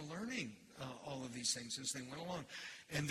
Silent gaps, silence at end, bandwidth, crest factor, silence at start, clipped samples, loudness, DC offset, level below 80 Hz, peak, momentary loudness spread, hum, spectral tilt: none; 0 s; 15.5 kHz; 22 dB; 0 s; under 0.1%; -44 LUFS; under 0.1%; -74 dBFS; -24 dBFS; 10 LU; none; -3 dB/octave